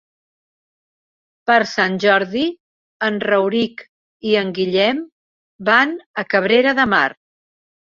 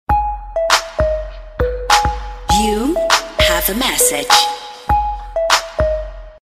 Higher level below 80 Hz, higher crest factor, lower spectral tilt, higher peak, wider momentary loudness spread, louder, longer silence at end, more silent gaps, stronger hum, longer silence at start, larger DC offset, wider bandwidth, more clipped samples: second, -60 dBFS vs -26 dBFS; about the same, 18 dB vs 16 dB; first, -5 dB/octave vs -2.5 dB/octave; about the same, -2 dBFS vs 0 dBFS; about the same, 10 LU vs 10 LU; about the same, -17 LUFS vs -15 LUFS; first, 0.7 s vs 0.1 s; first, 2.60-3.00 s, 3.89-4.20 s, 5.12-5.59 s, 6.06-6.14 s vs none; neither; first, 1.45 s vs 0.1 s; neither; second, 7.4 kHz vs 15.5 kHz; neither